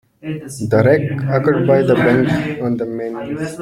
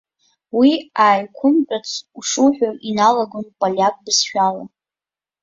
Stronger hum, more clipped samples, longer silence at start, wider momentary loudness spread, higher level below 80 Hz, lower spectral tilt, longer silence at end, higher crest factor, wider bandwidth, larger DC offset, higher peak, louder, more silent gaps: neither; neither; second, 0.25 s vs 0.55 s; about the same, 12 LU vs 10 LU; first, -48 dBFS vs -64 dBFS; first, -7.5 dB/octave vs -3 dB/octave; second, 0 s vs 0.75 s; about the same, 14 dB vs 16 dB; first, 14.5 kHz vs 7.8 kHz; neither; about the same, -2 dBFS vs -2 dBFS; about the same, -16 LUFS vs -17 LUFS; neither